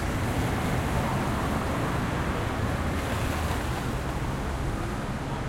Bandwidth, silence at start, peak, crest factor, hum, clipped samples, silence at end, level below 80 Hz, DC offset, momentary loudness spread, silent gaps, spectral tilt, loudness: 16.5 kHz; 0 s; -14 dBFS; 14 dB; none; under 0.1%; 0 s; -36 dBFS; under 0.1%; 4 LU; none; -6 dB/octave; -29 LUFS